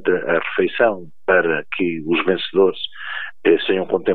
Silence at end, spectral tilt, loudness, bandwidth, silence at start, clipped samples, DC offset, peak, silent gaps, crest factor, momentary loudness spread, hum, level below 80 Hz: 0 s; -8.5 dB/octave; -19 LUFS; 4.5 kHz; 0.05 s; under 0.1%; 2%; -2 dBFS; none; 18 dB; 10 LU; none; -66 dBFS